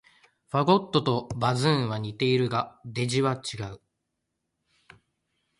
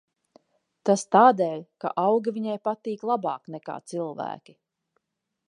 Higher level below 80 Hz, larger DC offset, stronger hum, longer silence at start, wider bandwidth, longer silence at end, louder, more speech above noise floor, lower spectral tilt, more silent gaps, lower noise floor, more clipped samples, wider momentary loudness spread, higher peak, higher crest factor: first, -60 dBFS vs -82 dBFS; neither; neither; second, 0.55 s vs 0.85 s; about the same, 11.5 kHz vs 11 kHz; first, 1.8 s vs 1.15 s; about the same, -26 LUFS vs -25 LUFS; about the same, 55 dB vs 57 dB; about the same, -6 dB/octave vs -5.5 dB/octave; neither; about the same, -81 dBFS vs -81 dBFS; neither; second, 11 LU vs 18 LU; second, -8 dBFS vs -4 dBFS; about the same, 20 dB vs 22 dB